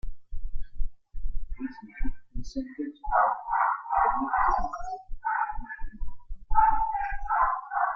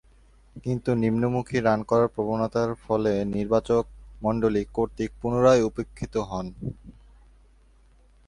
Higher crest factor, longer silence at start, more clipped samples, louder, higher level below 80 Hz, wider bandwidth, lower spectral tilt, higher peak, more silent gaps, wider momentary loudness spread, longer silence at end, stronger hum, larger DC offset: about the same, 18 dB vs 20 dB; second, 0.05 s vs 0.55 s; neither; second, -28 LUFS vs -25 LUFS; first, -36 dBFS vs -48 dBFS; second, 6.4 kHz vs 11 kHz; about the same, -6.5 dB/octave vs -7.5 dB/octave; about the same, -8 dBFS vs -6 dBFS; neither; first, 19 LU vs 12 LU; second, 0 s vs 1.35 s; neither; neither